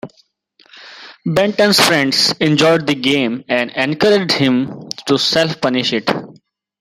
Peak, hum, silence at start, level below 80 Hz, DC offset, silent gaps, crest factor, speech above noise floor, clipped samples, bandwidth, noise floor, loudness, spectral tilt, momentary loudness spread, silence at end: 0 dBFS; none; 0.05 s; -56 dBFS; under 0.1%; none; 16 dB; 41 dB; under 0.1%; 16.5 kHz; -55 dBFS; -14 LUFS; -4 dB/octave; 11 LU; 0.5 s